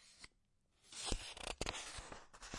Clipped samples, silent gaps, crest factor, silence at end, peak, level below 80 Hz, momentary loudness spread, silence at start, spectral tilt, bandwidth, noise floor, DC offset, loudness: under 0.1%; none; 28 dB; 0 s; -20 dBFS; -54 dBFS; 16 LU; 0 s; -2 dB/octave; 11.5 kHz; -78 dBFS; under 0.1%; -46 LUFS